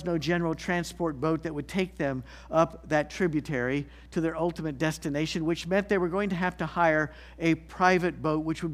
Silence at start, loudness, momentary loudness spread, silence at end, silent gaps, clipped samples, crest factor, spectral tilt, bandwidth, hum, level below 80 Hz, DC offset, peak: 0 s; -28 LUFS; 7 LU; 0 s; none; under 0.1%; 20 dB; -6 dB/octave; 15 kHz; none; -50 dBFS; under 0.1%; -8 dBFS